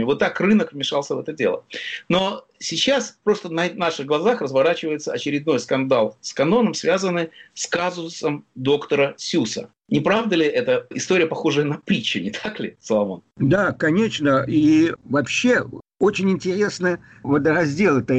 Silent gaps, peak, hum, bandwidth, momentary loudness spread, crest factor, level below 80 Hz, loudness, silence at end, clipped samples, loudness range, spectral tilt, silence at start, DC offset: none; -8 dBFS; none; 8.8 kHz; 8 LU; 12 dB; -58 dBFS; -21 LUFS; 0 s; under 0.1%; 3 LU; -5 dB/octave; 0 s; under 0.1%